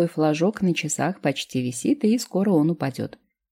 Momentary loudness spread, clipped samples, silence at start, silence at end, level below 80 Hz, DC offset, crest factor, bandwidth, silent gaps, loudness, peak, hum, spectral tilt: 7 LU; under 0.1%; 0 s; 0.45 s; -66 dBFS; under 0.1%; 14 dB; 16.5 kHz; none; -23 LUFS; -8 dBFS; none; -5.5 dB/octave